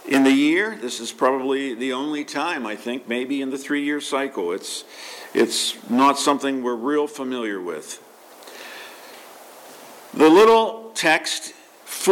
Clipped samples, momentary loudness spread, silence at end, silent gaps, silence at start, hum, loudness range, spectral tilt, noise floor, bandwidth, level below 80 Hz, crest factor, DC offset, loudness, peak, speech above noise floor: under 0.1%; 21 LU; 0 s; none; 0.05 s; none; 8 LU; -3 dB/octave; -43 dBFS; 17 kHz; -70 dBFS; 16 dB; under 0.1%; -21 LUFS; -6 dBFS; 23 dB